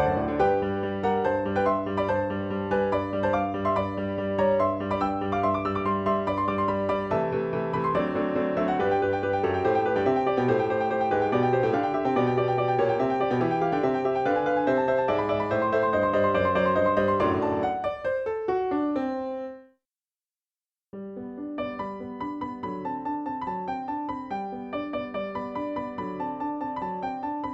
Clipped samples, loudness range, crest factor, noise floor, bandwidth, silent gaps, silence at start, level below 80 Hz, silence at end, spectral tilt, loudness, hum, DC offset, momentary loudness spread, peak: under 0.1%; 9 LU; 16 dB; under -90 dBFS; 7.8 kHz; none; 0 s; -54 dBFS; 0 s; -8 dB/octave; -26 LUFS; none; under 0.1%; 9 LU; -10 dBFS